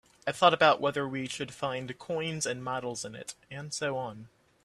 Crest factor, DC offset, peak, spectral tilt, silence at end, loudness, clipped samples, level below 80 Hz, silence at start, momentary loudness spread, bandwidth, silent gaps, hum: 24 dB; under 0.1%; -8 dBFS; -3.5 dB/octave; 0.4 s; -30 LUFS; under 0.1%; -70 dBFS; 0.25 s; 17 LU; 13.5 kHz; none; none